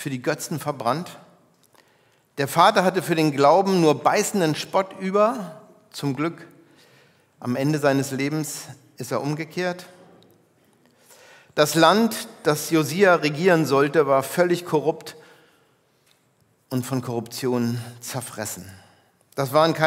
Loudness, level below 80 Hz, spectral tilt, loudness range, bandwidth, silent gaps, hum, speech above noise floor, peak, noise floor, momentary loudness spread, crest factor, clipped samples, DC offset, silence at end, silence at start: -22 LUFS; -74 dBFS; -5 dB/octave; 10 LU; 16 kHz; none; none; 42 dB; -2 dBFS; -63 dBFS; 15 LU; 22 dB; under 0.1%; under 0.1%; 0 s; 0 s